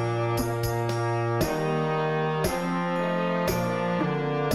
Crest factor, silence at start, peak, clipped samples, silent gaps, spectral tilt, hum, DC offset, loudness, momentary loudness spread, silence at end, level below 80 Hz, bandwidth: 14 dB; 0 s; -12 dBFS; under 0.1%; none; -6 dB/octave; none; 0.2%; -27 LUFS; 1 LU; 0 s; -46 dBFS; 16 kHz